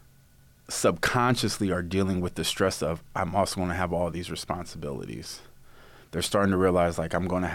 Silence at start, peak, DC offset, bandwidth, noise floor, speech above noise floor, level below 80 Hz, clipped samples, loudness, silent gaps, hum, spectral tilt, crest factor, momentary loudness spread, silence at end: 0.7 s; -10 dBFS; under 0.1%; 17 kHz; -57 dBFS; 30 dB; -48 dBFS; under 0.1%; -27 LUFS; none; none; -5 dB/octave; 16 dB; 12 LU; 0 s